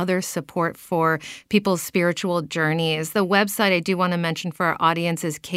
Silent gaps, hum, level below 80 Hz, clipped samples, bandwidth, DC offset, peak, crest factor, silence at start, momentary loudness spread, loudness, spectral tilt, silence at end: none; none; -62 dBFS; under 0.1%; 16 kHz; under 0.1%; -4 dBFS; 20 dB; 0 s; 6 LU; -22 LUFS; -4.5 dB/octave; 0 s